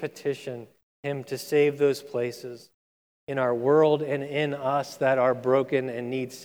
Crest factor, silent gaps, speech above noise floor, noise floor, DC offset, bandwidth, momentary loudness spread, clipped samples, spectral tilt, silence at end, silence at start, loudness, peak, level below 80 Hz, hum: 16 dB; 0.83-1.03 s, 2.74-3.27 s; over 64 dB; under -90 dBFS; under 0.1%; 18 kHz; 16 LU; under 0.1%; -6 dB/octave; 0 s; 0 s; -26 LUFS; -10 dBFS; -78 dBFS; none